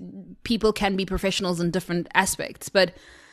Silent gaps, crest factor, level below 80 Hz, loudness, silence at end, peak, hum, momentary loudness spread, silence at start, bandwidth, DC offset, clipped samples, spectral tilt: none; 24 dB; -44 dBFS; -24 LUFS; 0.2 s; -2 dBFS; none; 6 LU; 0 s; 13.5 kHz; under 0.1%; under 0.1%; -4 dB/octave